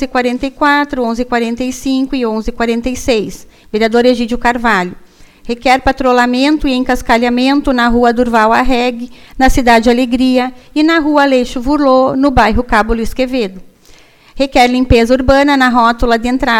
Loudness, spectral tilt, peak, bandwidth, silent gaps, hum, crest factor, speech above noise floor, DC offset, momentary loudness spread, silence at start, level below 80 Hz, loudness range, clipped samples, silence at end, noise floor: -12 LUFS; -5 dB/octave; 0 dBFS; 16 kHz; none; none; 12 dB; 31 dB; under 0.1%; 7 LU; 0 s; -26 dBFS; 4 LU; 0.2%; 0 s; -42 dBFS